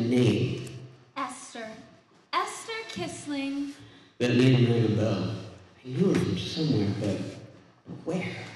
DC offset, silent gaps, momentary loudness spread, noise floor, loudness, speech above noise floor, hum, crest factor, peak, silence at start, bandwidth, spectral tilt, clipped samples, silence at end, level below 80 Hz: under 0.1%; none; 19 LU; -56 dBFS; -28 LUFS; 30 dB; none; 20 dB; -8 dBFS; 0 s; 12 kHz; -6.5 dB/octave; under 0.1%; 0 s; -62 dBFS